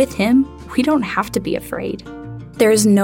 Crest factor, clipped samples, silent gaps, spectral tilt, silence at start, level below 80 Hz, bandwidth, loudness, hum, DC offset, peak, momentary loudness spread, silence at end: 16 dB; under 0.1%; none; -5 dB/octave; 0 s; -44 dBFS; 17 kHz; -18 LUFS; none; under 0.1%; -2 dBFS; 17 LU; 0 s